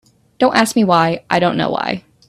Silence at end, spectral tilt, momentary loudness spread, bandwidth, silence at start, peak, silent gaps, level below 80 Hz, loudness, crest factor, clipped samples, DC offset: 0.3 s; -5 dB/octave; 6 LU; 14.5 kHz; 0.4 s; 0 dBFS; none; -54 dBFS; -15 LUFS; 16 dB; under 0.1%; under 0.1%